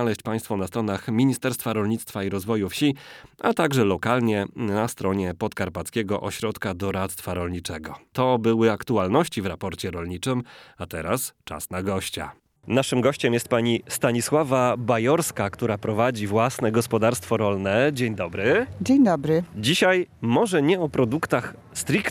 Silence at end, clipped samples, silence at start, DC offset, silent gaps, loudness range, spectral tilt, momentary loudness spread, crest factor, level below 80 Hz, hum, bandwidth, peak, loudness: 0 s; under 0.1%; 0 s; under 0.1%; none; 6 LU; -5.5 dB/octave; 9 LU; 18 dB; -54 dBFS; none; 19 kHz; -6 dBFS; -24 LUFS